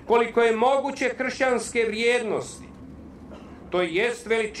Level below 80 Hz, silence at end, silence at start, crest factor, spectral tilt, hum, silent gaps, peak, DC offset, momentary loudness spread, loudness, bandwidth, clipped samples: -54 dBFS; 0 s; 0 s; 16 dB; -3.5 dB/octave; none; none; -8 dBFS; under 0.1%; 23 LU; -24 LUFS; 12.5 kHz; under 0.1%